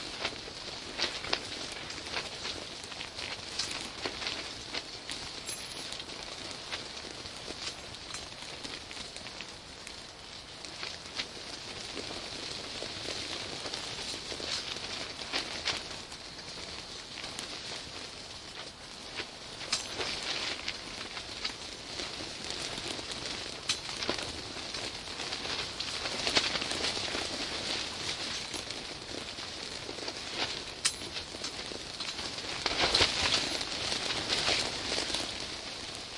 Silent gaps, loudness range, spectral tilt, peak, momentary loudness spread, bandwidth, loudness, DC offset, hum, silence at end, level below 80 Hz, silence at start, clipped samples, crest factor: none; 10 LU; -1.5 dB/octave; -4 dBFS; 11 LU; 11.5 kHz; -35 LUFS; under 0.1%; none; 0 s; -58 dBFS; 0 s; under 0.1%; 32 dB